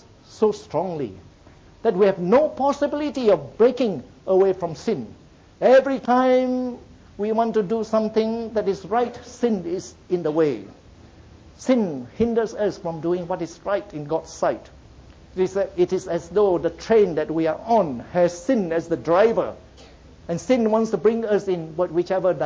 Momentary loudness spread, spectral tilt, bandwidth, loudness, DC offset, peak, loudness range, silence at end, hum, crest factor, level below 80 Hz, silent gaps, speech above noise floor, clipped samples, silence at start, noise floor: 10 LU; -6.5 dB/octave; 8 kHz; -22 LUFS; under 0.1%; -6 dBFS; 5 LU; 0 s; none; 16 dB; -52 dBFS; none; 28 dB; under 0.1%; 0.3 s; -49 dBFS